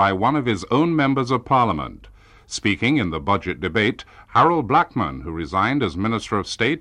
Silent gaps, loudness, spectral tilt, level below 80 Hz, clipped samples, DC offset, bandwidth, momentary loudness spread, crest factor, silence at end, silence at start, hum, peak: none; -20 LUFS; -5.5 dB/octave; -44 dBFS; under 0.1%; under 0.1%; 10.5 kHz; 8 LU; 16 dB; 0 s; 0 s; none; -6 dBFS